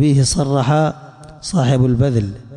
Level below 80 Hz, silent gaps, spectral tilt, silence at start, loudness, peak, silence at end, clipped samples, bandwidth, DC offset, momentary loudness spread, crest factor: -38 dBFS; none; -6 dB/octave; 0 s; -16 LUFS; -6 dBFS; 0 s; under 0.1%; 11.5 kHz; under 0.1%; 7 LU; 10 dB